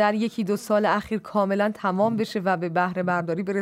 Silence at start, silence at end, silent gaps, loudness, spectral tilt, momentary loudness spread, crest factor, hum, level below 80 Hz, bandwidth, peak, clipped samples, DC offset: 0 s; 0 s; none; -24 LUFS; -6.5 dB/octave; 4 LU; 16 dB; none; -62 dBFS; 15.5 kHz; -8 dBFS; under 0.1%; under 0.1%